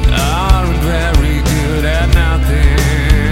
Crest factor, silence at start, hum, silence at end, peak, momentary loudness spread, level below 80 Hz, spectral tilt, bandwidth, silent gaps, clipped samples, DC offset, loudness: 10 dB; 0 s; none; 0 s; 0 dBFS; 2 LU; -12 dBFS; -5.5 dB/octave; 16 kHz; none; 0.3%; under 0.1%; -13 LUFS